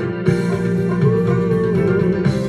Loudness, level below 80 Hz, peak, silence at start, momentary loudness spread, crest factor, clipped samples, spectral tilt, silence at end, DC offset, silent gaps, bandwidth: -17 LUFS; -42 dBFS; -4 dBFS; 0 s; 3 LU; 14 dB; under 0.1%; -8.5 dB/octave; 0 s; under 0.1%; none; 10.5 kHz